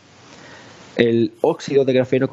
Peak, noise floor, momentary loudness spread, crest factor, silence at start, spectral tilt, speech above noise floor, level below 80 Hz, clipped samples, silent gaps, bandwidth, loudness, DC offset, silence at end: 0 dBFS; -44 dBFS; 4 LU; 18 dB; 0.5 s; -6.5 dB/octave; 27 dB; -62 dBFS; under 0.1%; none; 8 kHz; -18 LUFS; under 0.1%; 0.05 s